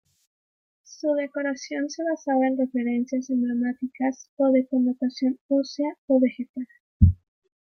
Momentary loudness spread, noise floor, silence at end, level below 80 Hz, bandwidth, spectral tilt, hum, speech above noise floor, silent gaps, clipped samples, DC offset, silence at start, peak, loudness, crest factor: 9 LU; under -90 dBFS; 0.6 s; -40 dBFS; 6.6 kHz; -7.5 dB/octave; none; over 65 dB; 4.29-4.37 s, 5.41-5.49 s, 5.98-6.08 s, 6.49-6.54 s, 6.80-7.00 s; under 0.1%; under 0.1%; 0.9 s; -4 dBFS; -25 LUFS; 22 dB